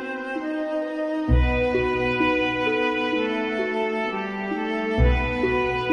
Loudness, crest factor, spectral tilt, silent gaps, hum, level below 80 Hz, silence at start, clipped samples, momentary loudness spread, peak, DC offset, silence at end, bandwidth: -23 LUFS; 14 dB; -7 dB/octave; none; none; -30 dBFS; 0 s; under 0.1%; 6 LU; -8 dBFS; under 0.1%; 0 s; 9.4 kHz